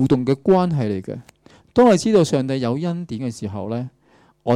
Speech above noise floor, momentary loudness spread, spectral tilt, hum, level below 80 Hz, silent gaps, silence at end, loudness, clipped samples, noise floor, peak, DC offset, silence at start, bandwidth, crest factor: 29 dB; 15 LU; -7 dB/octave; none; -52 dBFS; none; 0 s; -19 LUFS; under 0.1%; -48 dBFS; -6 dBFS; under 0.1%; 0 s; 13 kHz; 14 dB